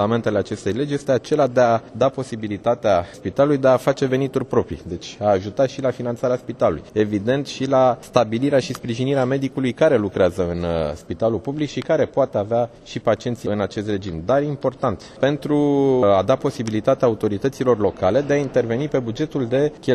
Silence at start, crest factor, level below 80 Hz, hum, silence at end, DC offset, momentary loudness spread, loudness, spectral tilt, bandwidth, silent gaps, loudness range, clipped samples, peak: 0 s; 20 dB; -48 dBFS; none; 0 s; under 0.1%; 7 LU; -20 LUFS; -6.5 dB/octave; 13 kHz; none; 3 LU; under 0.1%; 0 dBFS